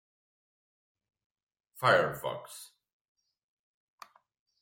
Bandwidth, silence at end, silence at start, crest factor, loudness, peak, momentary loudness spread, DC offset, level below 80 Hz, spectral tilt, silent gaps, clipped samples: 16.5 kHz; 1.95 s; 1.75 s; 26 dB; -29 LUFS; -12 dBFS; 22 LU; under 0.1%; -74 dBFS; -4 dB/octave; none; under 0.1%